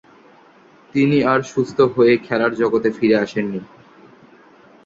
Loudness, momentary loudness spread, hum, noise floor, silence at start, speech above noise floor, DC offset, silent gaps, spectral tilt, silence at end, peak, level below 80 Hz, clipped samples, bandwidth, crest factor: -18 LUFS; 9 LU; none; -49 dBFS; 0.95 s; 32 dB; under 0.1%; none; -7 dB/octave; 1.2 s; -2 dBFS; -58 dBFS; under 0.1%; 7.8 kHz; 18 dB